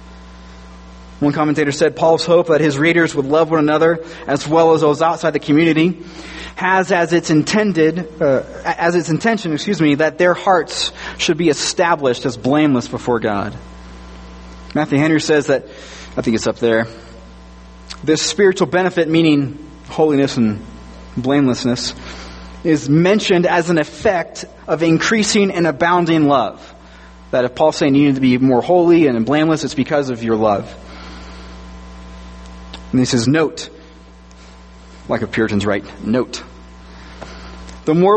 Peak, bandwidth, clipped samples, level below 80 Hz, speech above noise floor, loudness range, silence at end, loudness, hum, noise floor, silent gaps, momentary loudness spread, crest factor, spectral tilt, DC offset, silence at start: 0 dBFS; 8.8 kHz; under 0.1%; -42 dBFS; 25 dB; 7 LU; 0 s; -15 LUFS; none; -40 dBFS; none; 21 LU; 16 dB; -5.5 dB/octave; under 0.1%; 0 s